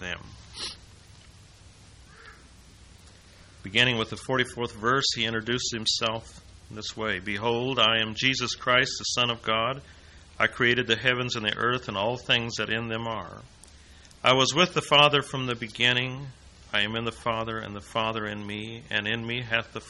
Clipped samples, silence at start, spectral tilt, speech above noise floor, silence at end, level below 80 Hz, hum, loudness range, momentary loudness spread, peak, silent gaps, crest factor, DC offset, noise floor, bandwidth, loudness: under 0.1%; 0 s; -3 dB/octave; 25 dB; 0 s; -54 dBFS; none; 6 LU; 15 LU; -4 dBFS; none; 24 dB; under 0.1%; -52 dBFS; 11.5 kHz; -25 LUFS